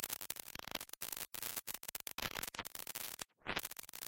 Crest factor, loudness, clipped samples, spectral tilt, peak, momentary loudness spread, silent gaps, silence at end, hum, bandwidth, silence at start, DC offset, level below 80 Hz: 30 dB; -44 LUFS; under 0.1%; -0.5 dB/octave; -16 dBFS; 4 LU; none; 0 s; none; 17 kHz; 0 s; under 0.1%; -68 dBFS